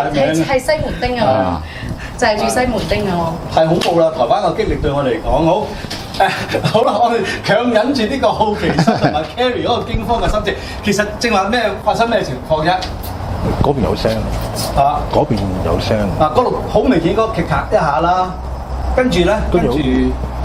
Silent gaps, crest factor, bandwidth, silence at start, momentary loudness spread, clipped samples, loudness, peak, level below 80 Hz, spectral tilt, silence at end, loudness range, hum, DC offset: none; 14 dB; 16.5 kHz; 0 s; 6 LU; under 0.1%; -15 LUFS; 0 dBFS; -28 dBFS; -5.5 dB/octave; 0 s; 2 LU; none; under 0.1%